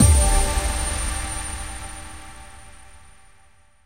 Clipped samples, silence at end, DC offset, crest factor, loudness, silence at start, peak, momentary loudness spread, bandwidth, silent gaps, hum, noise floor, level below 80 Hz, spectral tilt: under 0.1%; 1.15 s; 0.5%; 20 dB; -23 LUFS; 0 s; -4 dBFS; 24 LU; 16 kHz; none; none; -57 dBFS; -26 dBFS; -3.5 dB/octave